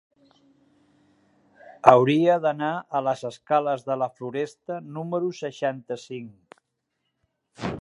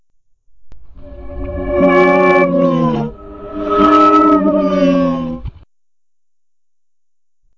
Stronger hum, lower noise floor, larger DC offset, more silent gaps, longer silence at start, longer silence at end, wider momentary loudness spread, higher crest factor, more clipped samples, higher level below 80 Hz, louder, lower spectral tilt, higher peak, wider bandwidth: neither; second, -78 dBFS vs -87 dBFS; neither; neither; first, 1.85 s vs 0.6 s; second, 0 s vs 2.05 s; second, 17 LU vs 20 LU; first, 26 dB vs 14 dB; neither; second, -64 dBFS vs -36 dBFS; second, -24 LUFS vs -12 LUFS; second, -6.5 dB/octave vs -8 dB/octave; about the same, 0 dBFS vs -2 dBFS; first, 11 kHz vs 7.4 kHz